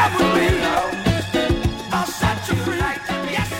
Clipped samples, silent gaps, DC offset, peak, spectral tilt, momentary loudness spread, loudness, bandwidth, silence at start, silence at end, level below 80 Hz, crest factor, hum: under 0.1%; none; under 0.1%; -6 dBFS; -5 dB/octave; 6 LU; -20 LUFS; 16.5 kHz; 0 s; 0 s; -32 dBFS; 14 dB; none